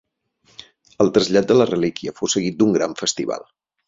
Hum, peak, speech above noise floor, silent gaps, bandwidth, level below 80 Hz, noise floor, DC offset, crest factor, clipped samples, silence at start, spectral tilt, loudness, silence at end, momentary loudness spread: none; -2 dBFS; 42 dB; none; 7.8 kHz; -56 dBFS; -61 dBFS; under 0.1%; 18 dB; under 0.1%; 1 s; -4.5 dB/octave; -19 LUFS; 0.5 s; 10 LU